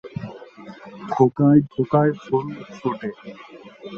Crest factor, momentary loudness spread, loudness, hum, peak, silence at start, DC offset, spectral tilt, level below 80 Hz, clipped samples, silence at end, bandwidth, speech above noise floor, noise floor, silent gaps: 20 dB; 24 LU; -20 LUFS; none; -2 dBFS; 0.05 s; under 0.1%; -9.5 dB/octave; -58 dBFS; under 0.1%; 0 s; 6.8 kHz; 20 dB; -41 dBFS; none